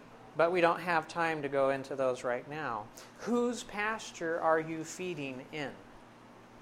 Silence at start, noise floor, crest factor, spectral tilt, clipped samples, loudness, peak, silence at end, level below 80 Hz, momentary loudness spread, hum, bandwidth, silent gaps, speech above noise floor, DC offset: 0 s; -55 dBFS; 22 dB; -4.5 dB/octave; under 0.1%; -33 LUFS; -12 dBFS; 0 s; -68 dBFS; 12 LU; none; 15.5 kHz; none; 22 dB; under 0.1%